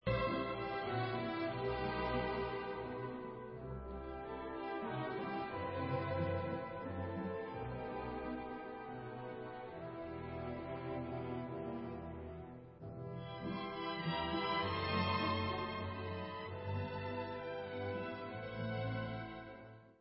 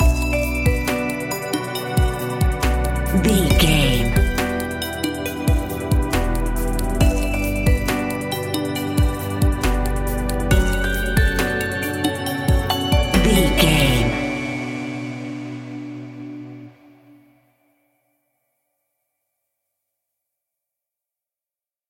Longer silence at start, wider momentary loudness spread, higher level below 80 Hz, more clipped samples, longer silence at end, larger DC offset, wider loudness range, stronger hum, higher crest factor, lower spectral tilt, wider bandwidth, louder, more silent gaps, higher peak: about the same, 0.05 s vs 0 s; about the same, 11 LU vs 13 LU; second, -56 dBFS vs -24 dBFS; neither; second, 0.05 s vs 5.2 s; neither; second, 7 LU vs 12 LU; neither; about the same, 18 dB vs 18 dB; about the same, -4.5 dB/octave vs -5 dB/octave; second, 5.6 kHz vs 17 kHz; second, -42 LUFS vs -20 LUFS; neither; second, -24 dBFS vs -2 dBFS